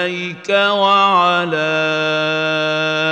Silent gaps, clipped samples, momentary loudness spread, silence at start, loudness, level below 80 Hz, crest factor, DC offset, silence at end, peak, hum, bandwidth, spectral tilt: none; under 0.1%; 5 LU; 0 s; -15 LUFS; -68 dBFS; 14 dB; under 0.1%; 0 s; -2 dBFS; none; 9 kHz; -4.5 dB/octave